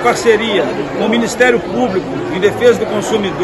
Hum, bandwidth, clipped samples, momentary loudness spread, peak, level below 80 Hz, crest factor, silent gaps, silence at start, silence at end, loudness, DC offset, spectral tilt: none; 12.5 kHz; 0.2%; 6 LU; 0 dBFS; -44 dBFS; 14 dB; none; 0 s; 0 s; -14 LUFS; under 0.1%; -4.5 dB/octave